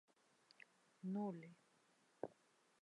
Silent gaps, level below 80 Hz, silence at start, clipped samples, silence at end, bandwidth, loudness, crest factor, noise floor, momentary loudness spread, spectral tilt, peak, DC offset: none; under -90 dBFS; 1.05 s; under 0.1%; 0.5 s; 11 kHz; -50 LUFS; 24 dB; -77 dBFS; 20 LU; -8 dB/octave; -30 dBFS; under 0.1%